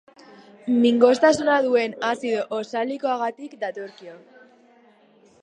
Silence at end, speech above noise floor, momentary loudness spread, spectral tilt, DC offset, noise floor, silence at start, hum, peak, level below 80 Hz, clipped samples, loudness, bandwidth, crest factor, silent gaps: 1.25 s; 34 dB; 15 LU; -4 dB/octave; under 0.1%; -56 dBFS; 0.65 s; none; -2 dBFS; -68 dBFS; under 0.1%; -21 LUFS; 9.6 kHz; 20 dB; none